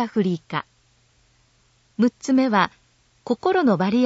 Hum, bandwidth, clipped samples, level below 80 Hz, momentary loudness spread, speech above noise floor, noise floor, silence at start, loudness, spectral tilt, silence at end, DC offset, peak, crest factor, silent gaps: none; 8 kHz; under 0.1%; -64 dBFS; 11 LU; 41 dB; -61 dBFS; 0 s; -22 LUFS; -6.5 dB/octave; 0 s; under 0.1%; -4 dBFS; 20 dB; none